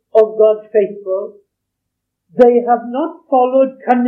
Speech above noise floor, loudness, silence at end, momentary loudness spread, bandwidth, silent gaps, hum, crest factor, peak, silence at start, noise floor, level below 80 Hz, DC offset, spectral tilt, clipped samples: 62 dB; -14 LUFS; 0 s; 11 LU; 5 kHz; none; none; 14 dB; 0 dBFS; 0.15 s; -76 dBFS; -60 dBFS; under 0.1%; -8 dB/octave; 0.2%